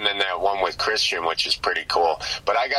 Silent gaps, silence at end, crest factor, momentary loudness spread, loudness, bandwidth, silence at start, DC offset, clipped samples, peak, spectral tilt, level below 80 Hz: none; 0 s; 18 dB; 2 LU; -22 LUFS; 14.5 kHz; 0 s; under 0.1%; under 0.1%; -4 dBFS; -1 dB/octave; -52 dBFS